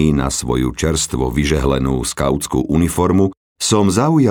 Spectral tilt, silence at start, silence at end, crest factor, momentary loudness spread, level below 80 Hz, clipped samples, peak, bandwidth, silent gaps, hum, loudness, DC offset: -5 dB/octave; 0 s; 0 s; 14 dB; 5 LU; -30 dBFS; under 0.1%; -2 dBFS; over 20 kHz; 3.37-3.56 s; none; -17 LUFS; under 0.1%